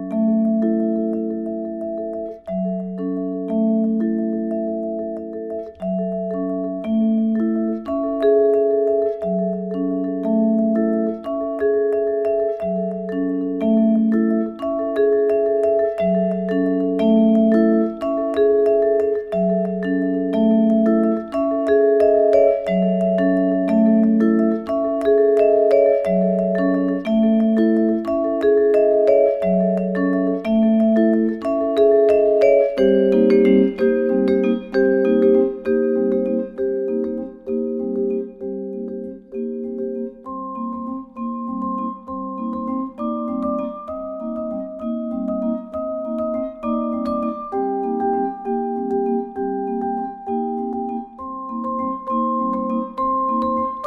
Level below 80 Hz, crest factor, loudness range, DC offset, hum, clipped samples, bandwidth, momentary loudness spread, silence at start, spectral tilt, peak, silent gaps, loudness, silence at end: -52 dBFS; 16 dB; 9 LU; under 0.1%; none; under 0.1%; 5.6 kHz; 12 LU; 0 s; -9.5 dB/octave; -2 dBFS; none; -19 LUFS; 0 s